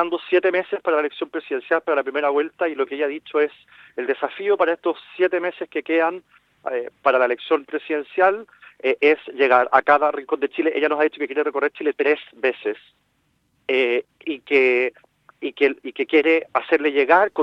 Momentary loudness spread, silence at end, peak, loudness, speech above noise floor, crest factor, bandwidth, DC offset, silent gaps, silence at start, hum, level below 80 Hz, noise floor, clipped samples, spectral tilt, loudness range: 11 LU; 0 s; -2 dBFS; -21 LUFS; 46 dB; 20 dB; 5.8 kHz; under 0.1%; none; 0 s; none; -74 dBFS; -67 dBFS; under 0.1%; -5.5 dB/octave; 4 LU